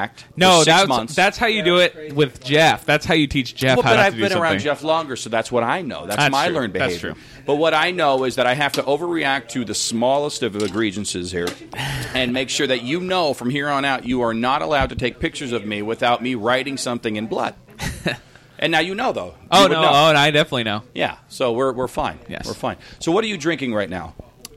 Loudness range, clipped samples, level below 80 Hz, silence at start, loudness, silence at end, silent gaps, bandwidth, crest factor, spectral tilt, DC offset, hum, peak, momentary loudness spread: 6 LU; under 0.1%; -46 dBFS; 0 s; -19 LUFS; 0.1 s; none; 16.5 kHz; 20 dB; -4 dB/octave; under 0.1%; none; 0 dBFS; 12 LU